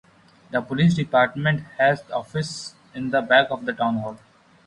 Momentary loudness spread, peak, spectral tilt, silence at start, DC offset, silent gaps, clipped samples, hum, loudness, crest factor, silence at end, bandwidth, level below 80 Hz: 13 LU; -4 dBFS; -6 dB/octave; 0.5 s; under 0.1%; none; under 0.1%; none; -22 LUFS; 20 dB; 0.5 s; 11 kHz; -58 dBFS